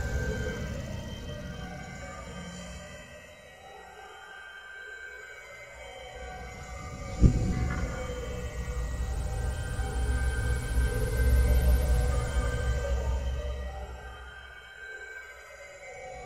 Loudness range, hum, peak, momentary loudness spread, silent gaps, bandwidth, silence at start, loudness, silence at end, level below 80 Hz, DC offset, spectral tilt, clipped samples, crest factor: 15 LU; none; -8 dBFS; 19 LU; none; 14.5 kHz; 0 s; -32 LUFS; 0 s; -32 dBFS; under 0.1%; -6 dB/octave; under 0.1%; 24 dB